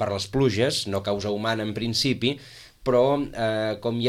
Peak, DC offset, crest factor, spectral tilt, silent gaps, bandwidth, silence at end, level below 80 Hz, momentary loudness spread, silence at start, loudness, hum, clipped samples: -10 dBFS; under 0.1%; 16 dB; -5 dB/octave; none; 16 kHz; 0 s; -50 dBFS; 6 LU; 0 s; -24 LUFS; none; under 0.1%